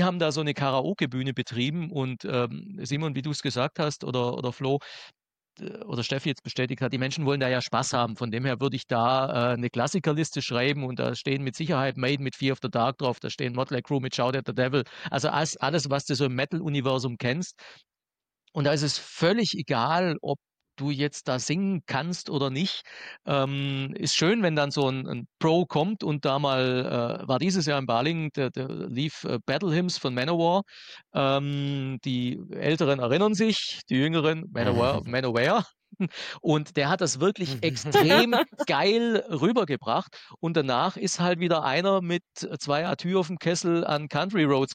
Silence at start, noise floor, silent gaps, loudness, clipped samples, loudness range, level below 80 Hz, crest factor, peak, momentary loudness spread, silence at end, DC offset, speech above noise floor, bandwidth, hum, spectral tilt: 0 s; under -90 dBFS; none; -26 LUFS; under 0.1%; 5 LU; -64 dBFS; 20 dB; -8 dBFS; 7 LU; 0 s; under 0.1%; over 64 dB; 16 kHz; none; -5 dB/octave